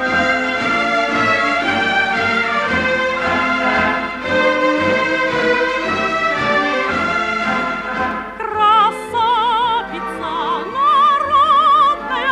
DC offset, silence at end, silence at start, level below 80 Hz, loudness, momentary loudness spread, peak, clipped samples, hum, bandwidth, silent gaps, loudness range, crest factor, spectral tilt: under 0.1%; 0 s; 0 s; -46 dBFS; -15 LUFS; 8 LU; -4 dBFS; under 0.1%; none; 12.5 kHz; none; 2 LU; 12 dB; -4 dB/octave